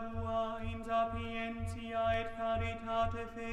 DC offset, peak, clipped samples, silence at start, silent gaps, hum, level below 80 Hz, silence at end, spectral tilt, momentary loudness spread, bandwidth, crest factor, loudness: under 0.1%; -22 dBFS; under 0.1%; 0 s; none; none; -50 dBFS; 0 s; -6.5 dB/octave; 6 LU; 12 kHz; 14 dB; -37 LUFS